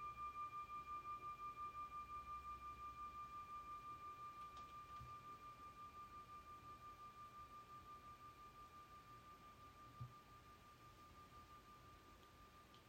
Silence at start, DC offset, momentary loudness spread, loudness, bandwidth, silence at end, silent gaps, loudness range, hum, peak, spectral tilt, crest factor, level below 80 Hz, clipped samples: 0 s; under 0.1%; 12 LU; -56 LUFS; 16.5 kHz; 0 s; none; 9 LU; none; -42 dBFS; -4.5 dB/octave; 14 dB; -72 dBFS; under 0.1%